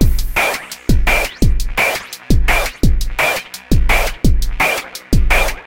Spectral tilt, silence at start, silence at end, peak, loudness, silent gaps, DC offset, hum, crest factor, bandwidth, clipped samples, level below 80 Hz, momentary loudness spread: -4.5 dB/octave; 0 s; 0.05 s; 0 dBFS; -16 LUFS; none; under 0.1%; none; 14 dB; 17 kHz; under 0.1%; -16 dBFS; 5 LU